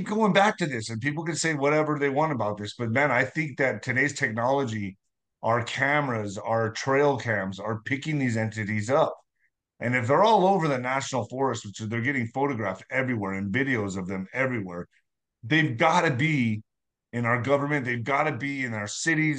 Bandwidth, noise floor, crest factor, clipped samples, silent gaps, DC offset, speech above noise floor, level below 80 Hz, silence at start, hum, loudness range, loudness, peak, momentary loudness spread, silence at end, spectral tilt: 10 kHz; -74 dBFS; 18 dB; under 0.1%; none; under 0.1%; 49 dB; -68 dBFS; 0 s; none; 3 LU; -26 LUFS; -8 dBFS; 10 LU; 0 s; -5.5 dB/octave